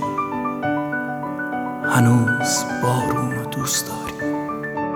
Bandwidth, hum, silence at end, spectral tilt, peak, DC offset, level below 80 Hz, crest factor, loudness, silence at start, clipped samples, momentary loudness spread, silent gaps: 19.5 kHz; none; 0 s; -4.5 dB/octave; -4 dBFS; under 0.1%; -52 dBFS; 18 dB; -21 LUFS; 0 s; under 0.1%; 10 LU; none